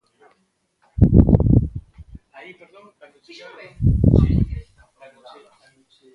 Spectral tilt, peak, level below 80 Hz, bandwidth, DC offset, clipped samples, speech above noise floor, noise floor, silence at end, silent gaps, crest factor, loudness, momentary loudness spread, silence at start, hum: -11 dB/octave; 0 dBFS; -26 dBFS; 5 kHz; under 0.1%; under 0.1%; 50 dB; -68 dBFS; 1.55 s; none; 20 dB; -17 LUFS; 24 LU; 1 s; none